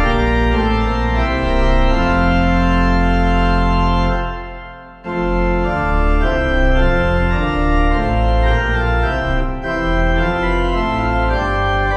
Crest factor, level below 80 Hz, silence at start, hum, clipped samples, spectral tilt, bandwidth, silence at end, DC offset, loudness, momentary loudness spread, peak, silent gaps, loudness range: 12 dB; -18 dBFS; 0 s; none; under 0.1%; -7.5 dB/octave; 6.6 kHz; 0 s; under 0.1%; -17 LUFS; 5 LU; -2 dBFS; none; 2 LU